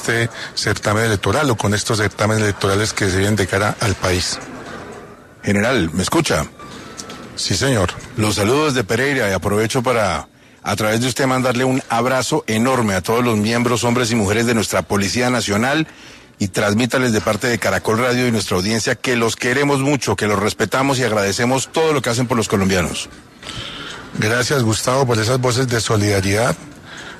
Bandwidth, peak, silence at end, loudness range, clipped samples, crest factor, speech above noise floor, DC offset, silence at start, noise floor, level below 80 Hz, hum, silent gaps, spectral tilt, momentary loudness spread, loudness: 13.5 kHz; -4 dBFS; 0 s; 2 LU; under 0.1%; 14 dB; 21 dB; under 0.1%; 0 s; -38 dBFS; -44 dBFS; none; none; -4.5 dB/octave; 11 LU; -17 LUFS